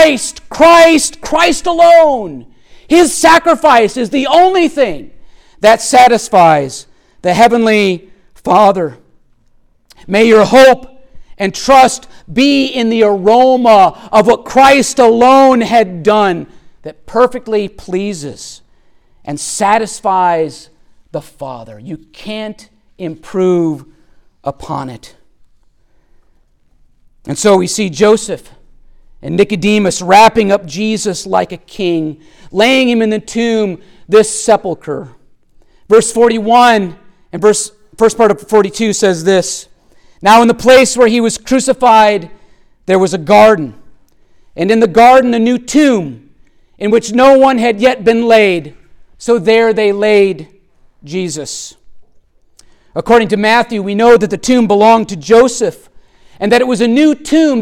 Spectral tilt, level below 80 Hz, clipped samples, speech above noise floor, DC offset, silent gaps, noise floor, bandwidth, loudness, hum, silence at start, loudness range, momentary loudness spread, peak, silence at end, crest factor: -4 dB/octave; -42 dBFS; under 0.1%; 41 dB; under 0.1%; none; -51 dBFS; 17 kHz; -10 LUFS; none; 0 s; 9 LU; 17 LU; 0 dBFS; 0 s; 10 dB